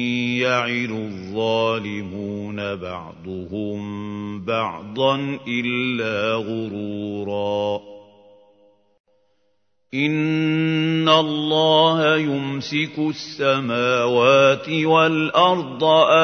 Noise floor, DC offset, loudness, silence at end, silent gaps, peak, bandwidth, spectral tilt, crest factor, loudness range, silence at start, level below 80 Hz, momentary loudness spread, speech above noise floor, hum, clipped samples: -71 dBFS; under 0.1%; -20 LUFS; 0 s; 9.00-9.04 s; -2 dBFS; 6.6 kHz; -5.5 dB/octave; 18 dB; 9 LU; 0 s; -64 dBFS; 14 LU; 50 dB; none; under 0.1%